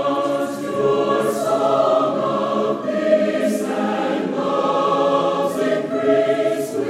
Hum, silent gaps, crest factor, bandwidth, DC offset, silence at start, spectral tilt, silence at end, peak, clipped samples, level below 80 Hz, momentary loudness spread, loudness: none; none; 14 dB; 15.5 kHz; under 0.1%; 0 s; -5.5 dB/octave; 0 s; -4 dBFS; under 0.1%; -70 dBFS; 4 LU; -19 LUFS